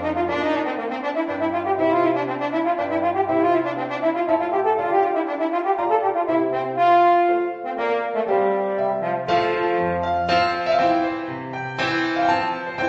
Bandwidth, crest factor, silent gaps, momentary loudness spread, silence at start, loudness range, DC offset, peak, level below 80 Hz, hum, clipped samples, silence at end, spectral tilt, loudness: 7.8 kHz; 16 dB; none; 6 LU; 0 s; 2 LU; under 0.1%; -6 dBFS; -56 dBFS; none; under 0.1%; 0 s; -6.5 dB/octave; -21 LUFS